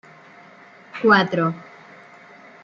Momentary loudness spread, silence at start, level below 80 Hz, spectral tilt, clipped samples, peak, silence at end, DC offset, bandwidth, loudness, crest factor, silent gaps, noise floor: 21 LU; 0.95 s; -70 dBFS; -7 dB/octave; under 0.1%; -2 dBFS; 1 s; under 0.1%; 7.2 kHz; -18 LUFS; 22 dB; none; -47 dBFS